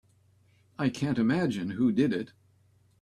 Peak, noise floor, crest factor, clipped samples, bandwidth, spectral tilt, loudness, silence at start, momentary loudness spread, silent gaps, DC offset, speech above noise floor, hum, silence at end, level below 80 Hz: -12 dBFS; -64 dBFS; 18 dB; under 0.1%; 11 kHz; -7 dB/octave; -28 LUFS; 0.8 s; 11 LU; none; under 0.1%; 37 dB; none; 0.75 s; -64 dBFS